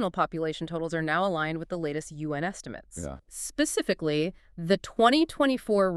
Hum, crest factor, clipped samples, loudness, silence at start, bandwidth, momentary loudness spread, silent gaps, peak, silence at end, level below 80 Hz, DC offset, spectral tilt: none; 20 dB; under 0.1%; -28 LUFS; 0 s; 13.5 kHz; 16 LU; none; -8 dBFS; 0 s; -54 dBFS; under 0.1%; -4.5 dB/octave